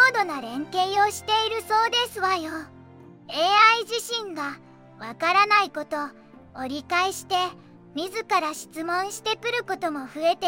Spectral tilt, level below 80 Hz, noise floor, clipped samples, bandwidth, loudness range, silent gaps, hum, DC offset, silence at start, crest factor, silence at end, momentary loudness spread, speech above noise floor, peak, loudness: -2 dB/octave; -68 dBFS; -47 dBFS; under 0.1%; 17 kHz; 6 LU; none; none; under 0.1%; 0 s; 20 dB; 0 s; 15 LU; 23 dB; -4 dBFS; -24 LUFS